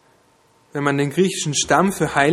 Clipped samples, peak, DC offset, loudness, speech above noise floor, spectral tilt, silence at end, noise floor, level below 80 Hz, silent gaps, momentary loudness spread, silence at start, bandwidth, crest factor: under 0.1%; -2 dBFS; under 0.1%; -19 LUFS; 39 dB; -4 dB/octave; 0 s; -57 dBFS; -52 dBFS; none; 6 LU; 0.75 s; 15 kHz; 18 dB